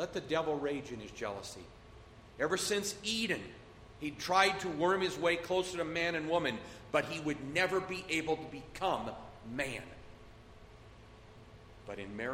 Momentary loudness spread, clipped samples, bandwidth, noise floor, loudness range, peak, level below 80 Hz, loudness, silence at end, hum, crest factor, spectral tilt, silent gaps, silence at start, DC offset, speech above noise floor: 16 LU; under 0.1%; 16 kHz; -55 dBFS; 9 LU; -14 dBFS; -60 dBFS; -35 LUFS; 0 s; none; 22 dB; -3.5 dB/octave; none; 0 s; under 0.1%; 20 dB